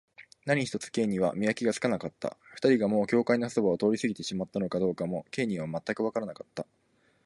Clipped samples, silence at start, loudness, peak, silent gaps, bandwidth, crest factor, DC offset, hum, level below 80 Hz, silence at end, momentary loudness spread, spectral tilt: under 0.1%; 0.2 s; -29 LUFS; -12 dBFS; none; 11.5 kHz; 18 dB; under 0.1%; none; -66 dBFS; 0.6 s; 12 LU; -6 dB/octave